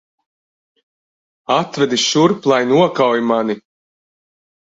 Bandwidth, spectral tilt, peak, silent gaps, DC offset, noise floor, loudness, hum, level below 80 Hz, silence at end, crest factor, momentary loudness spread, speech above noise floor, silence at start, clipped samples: 8 kHz; -4.5 dB/octave; 0 dBFS; none; under 0.1%; under -90 dBFS; -15 LUFS; none; -60 dBFS; 1.2 s; 18 dB; 8 LU; over 75 dB; 1.5 s; under 0.1%